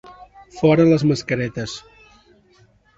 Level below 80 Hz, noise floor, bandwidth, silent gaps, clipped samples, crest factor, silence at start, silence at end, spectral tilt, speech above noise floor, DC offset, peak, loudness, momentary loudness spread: -52 dBFS; -55 dBFS; 8 kHz; none; under 0.1%; 18 dB; 0.1 s; 1.2 s; -7 dB/octave; 38 dB; under 0.1%; -2 dBFS; -18 LUFS; 16 LU